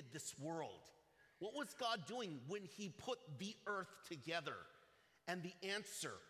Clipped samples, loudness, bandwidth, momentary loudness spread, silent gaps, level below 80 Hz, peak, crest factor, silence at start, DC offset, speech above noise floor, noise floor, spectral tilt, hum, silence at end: under 0.1%; -48 LUFS; 16 kHz; 9 LU; none; -86 dBFS; -28 dBFS; 20 dB; 0 s; under 0.1%; 25 dB; -73 dBFS; -3.5 dB/octave; none; 0 s